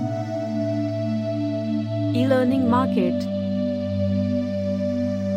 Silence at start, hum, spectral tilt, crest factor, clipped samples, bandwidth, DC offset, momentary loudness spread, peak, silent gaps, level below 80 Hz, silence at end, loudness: 0 s; none; -8.5 dB/octave; 14 dB; under 0.1%; 10 kHz; under 0.1%; 6 LU; -8 dBFS; none; -66 dBFS; 0 s; -23 LUFS